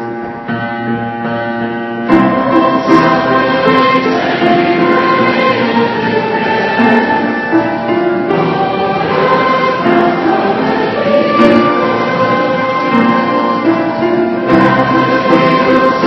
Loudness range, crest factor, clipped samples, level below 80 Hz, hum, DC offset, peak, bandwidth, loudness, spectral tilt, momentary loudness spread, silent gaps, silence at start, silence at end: 2 LU; 10 dB; 0.3%; -48 dBFS; none; under 0.1%; 0 dBFS; 6.4 kHz; -11 LUFS; -7 dB/octave; 8 LU; none; 0 s; 0 s